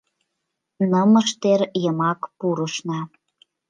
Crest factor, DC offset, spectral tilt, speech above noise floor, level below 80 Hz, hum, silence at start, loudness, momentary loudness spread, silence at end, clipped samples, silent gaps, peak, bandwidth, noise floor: 16 dB; under 0.1%; -5.5 dB/octave; 59 dB; -74 dBFS; none; 0.8 s; -21 LUFS; 12 LU; 0.6 s; under 0.1%; none; -6 dBFS; 9.6 kHz; -79 dBFS